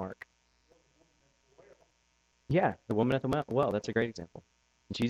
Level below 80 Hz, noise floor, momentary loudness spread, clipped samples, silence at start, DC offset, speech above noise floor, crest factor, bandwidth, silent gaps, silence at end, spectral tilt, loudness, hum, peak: -60 dBFS; -72 dBFS; 19 LU; under 0.1%; 0 s; under 0.1%; 42 dB; 20 dB; 13.5 kHz; none; 0 s; -7 dB/octave; -31 LUFS; none; -14 dBFS